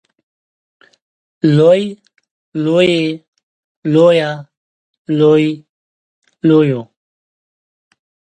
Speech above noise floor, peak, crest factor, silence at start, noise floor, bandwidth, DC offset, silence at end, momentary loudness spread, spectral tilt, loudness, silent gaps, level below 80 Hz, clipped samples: over 78 dB; 0 dBFS; 16 dB; 1.45 s; under -90 dBFS; 9.2 kHz; under 0.1%; 1.55 s; 15 LU; -7.5 dB/octave; -13 LUFS; 2.31-2.52 s, 3.28-3.33 s, 3.43-3.82 s, 4.57-5.05 s, 5.69-6.22 s; -62 dBFS; under 0.1%